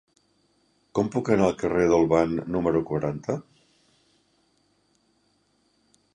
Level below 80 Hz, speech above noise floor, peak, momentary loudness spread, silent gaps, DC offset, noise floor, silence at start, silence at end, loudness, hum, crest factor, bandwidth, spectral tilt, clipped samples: -52 dBFS; 44 dB; -6 dBFS; 11 LU; none; under 0.1%; -68 dBFS; 0.95 s; 2.75 s; -24 LUFS; 50 Hz at -55 dBFS; 20 dB; 9.8 kHz; -7.5 dB/octave; under 0.1%